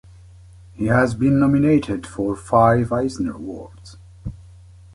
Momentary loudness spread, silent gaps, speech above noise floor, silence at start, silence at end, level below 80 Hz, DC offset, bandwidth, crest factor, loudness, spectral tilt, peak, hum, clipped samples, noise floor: 20 LU; none; 26 dB; 0.75 s; 0.55 s; -42 dBFS; under 0.1%; 11.5 kHz; 18 dB; -19 LUFS; -8 dB/octave; -2 dBFS; none; under 0.1%; -44 dBFS